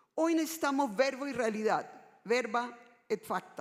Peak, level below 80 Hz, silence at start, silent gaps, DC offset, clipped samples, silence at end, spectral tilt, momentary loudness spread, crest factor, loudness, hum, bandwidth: -16 dBFS; -80 dBFS; 0.15 s; none; under 0.1%; under 0.1%; 0 s; -4 dB/octave; 8 LU; 18 dB; -33 LUFS; none; 16 kHz